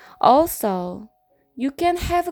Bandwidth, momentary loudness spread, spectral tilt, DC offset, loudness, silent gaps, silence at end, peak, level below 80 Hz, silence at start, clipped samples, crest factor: over 20 kHz; 14 LU; -5 dB/octave; under 0.1%; -20 LUFS; none; 0 s; -2 dBFS; -40 dBFS; 0.2 s; under 0.1%; 20 dB